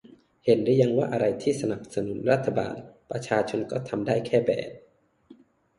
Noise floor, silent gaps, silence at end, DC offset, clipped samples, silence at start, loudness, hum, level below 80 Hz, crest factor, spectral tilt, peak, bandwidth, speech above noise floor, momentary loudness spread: -55 dBFS; none; 0.45 s; under 0.1%; under 0.1%; 0.45 s; -26 LUFS; none; -62 dBFS; 18 dB; -6.5 dB/octave; -8 dBFS; 11.5 kHz; 30 dB; 11 LU